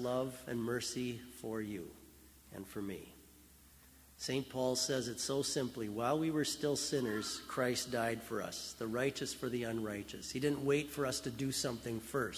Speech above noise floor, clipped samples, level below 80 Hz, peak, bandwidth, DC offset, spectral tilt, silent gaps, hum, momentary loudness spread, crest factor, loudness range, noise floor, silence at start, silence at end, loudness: 23 dB; under 0.1%; -66 dBFS; -22 dBFS; 16 kHz; under 0.1%; -4 dB/octave; none; none; 10 LU; 18 dB; 8 LU; -61 dBFS; 0 s; 0 s; -38 LUFS